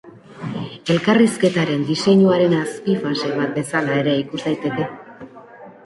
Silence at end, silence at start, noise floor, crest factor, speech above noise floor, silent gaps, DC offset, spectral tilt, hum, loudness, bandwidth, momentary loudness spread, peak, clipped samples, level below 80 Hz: 0.15 s; 0.05 s; -41 dBFS; 16 dB; 23 dB; none; under 0.1%; -6 dB/octave; none; -19 LUFS; 11.5 kHz; 14 LU; -4 dBFS; under 0.1%; -60 dBFS